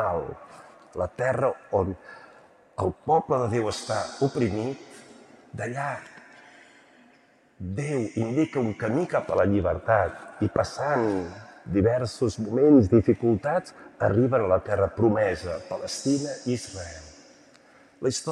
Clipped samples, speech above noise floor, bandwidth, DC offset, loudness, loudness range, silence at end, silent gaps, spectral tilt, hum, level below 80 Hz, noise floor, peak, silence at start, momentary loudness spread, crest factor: under 0.1%; 35 dB; 12 kHz; under 0.1%; -25 LUFS; 9 LU; 0 s; none; -6.5 dB/octave; none; -56 dBFS; -59 dBFS; -6 dBFS; 0 s; 16 LU; 20 dB